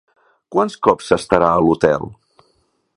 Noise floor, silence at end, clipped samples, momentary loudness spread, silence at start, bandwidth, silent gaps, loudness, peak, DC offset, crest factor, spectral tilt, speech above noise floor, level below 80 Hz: -63 dBFS; 0.85 s; under 0.1%; 8 LU; 0.5 s; 11.5 kHz; none; -16 LUFS; 0 dBFS; under 0.1%; 18 dB; -6 dB/octave; 48 dB; -46 dBFS